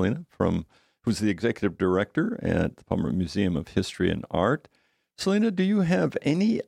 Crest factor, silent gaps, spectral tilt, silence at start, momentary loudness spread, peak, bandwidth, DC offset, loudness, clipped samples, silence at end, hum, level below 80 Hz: 18 dB; none; -6.5 dB/octave; 0 s; 6 LU; -8 dBFS; 12.5 kHz; under 0.1%; -26 LUFS; under 0.1%; 0.05 s; none; -50 dBFS